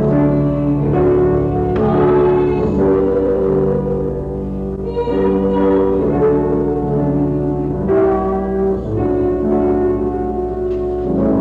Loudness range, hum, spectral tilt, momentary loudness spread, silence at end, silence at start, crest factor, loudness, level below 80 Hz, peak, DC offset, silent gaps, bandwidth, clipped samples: 2 LU; none; -11 dB/octave; 6 LU; 0 s; 0 s; 8 dB; -16 LUFS; -30 dBFS; -6 dBFS; under 0.1%; none; 4.5 kHz; under 0.1%